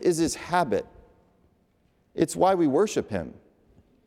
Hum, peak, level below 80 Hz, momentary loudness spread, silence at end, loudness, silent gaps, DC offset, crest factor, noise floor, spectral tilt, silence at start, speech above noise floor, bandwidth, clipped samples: none; -8 dBFS; -58 dBFS; 17 LU; 0.75 s; -25 LUFS; none; under 0.1%; 18 dB; -66 dBFS; -5 dB/octave; 0 s; 42 dB; 15.5 kHz; under 0.1%